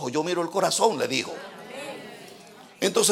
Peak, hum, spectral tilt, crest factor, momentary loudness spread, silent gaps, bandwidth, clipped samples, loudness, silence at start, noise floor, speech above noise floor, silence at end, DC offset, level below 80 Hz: -6 dBFS; none; -2.5 dB/octave; 20 dB; 21 LU; none; 16.5 kHz; under 0.1%; -25 LUFS; 0 s; -48 dBFS; 23 dB; 0 s; under 0.1%; -78 dBFS